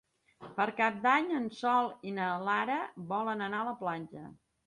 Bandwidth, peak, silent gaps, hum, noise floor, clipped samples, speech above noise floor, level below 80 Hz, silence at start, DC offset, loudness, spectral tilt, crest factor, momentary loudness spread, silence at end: 11 kHz; -12 dBFS; none; none; -53 dBFS; under 0.1%; 21 dB; -78 dBFS; 0.4 s; under 0.1%; -32 LUFS; -6 dB/octave; 20 dB; 13 LU; 0.35 s